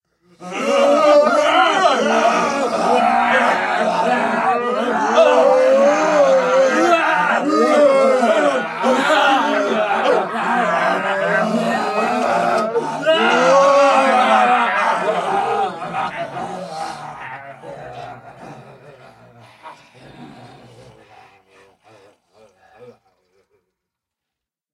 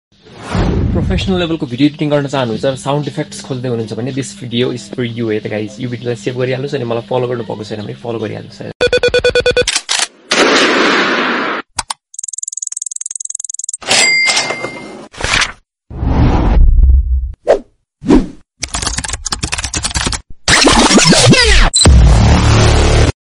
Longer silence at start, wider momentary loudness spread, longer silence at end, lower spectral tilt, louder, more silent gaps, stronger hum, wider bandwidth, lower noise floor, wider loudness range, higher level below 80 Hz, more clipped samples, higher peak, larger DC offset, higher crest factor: about the same, 0.4 s vs 0.3 s; about the same, 15 LU vs 15 LU; first, 1.85 s vs 0.1 s; about the same, -4 dB/octave vs -4 dB/octave; about the same, -15 LUFS vs -13 LUFS; second, none vs 8.75-8.80 s; neither; about the same, 12 kHz vs 11.5 kHz; first, -85 dBFS vs -32 dBFS; first, 13 LU vs 10 LU; second, -64 dBFS vs -18 dBFS; neither; about the same, 0 dBFS vs 0 dBFS; neither; about the same, 16 dB vs 12 dB